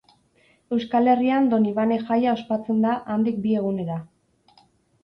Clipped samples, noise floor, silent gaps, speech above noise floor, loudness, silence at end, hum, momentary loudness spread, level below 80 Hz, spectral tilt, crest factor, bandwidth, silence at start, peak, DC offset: under 0.1%; -61 dBFS; none; 40 dB; -22 LUFS; 1 s; none; 9 LU; -64 dBFS; -8.5 dB/octave; 16 dB; 5.6 kHz; 0.7 s; -6 dBFS; under 0.1%